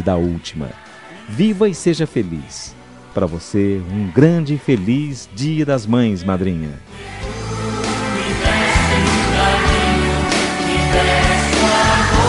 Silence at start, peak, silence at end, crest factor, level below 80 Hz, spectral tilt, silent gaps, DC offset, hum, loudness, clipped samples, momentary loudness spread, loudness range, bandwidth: 0 s; 0 dBFS; 0 s; 16 dB; -28 dBFS; -5 dB/octave; none; under 0.1%; none; -16 LUFS; under 0.1%; 16 LU; 5 LU; 11.5 kHz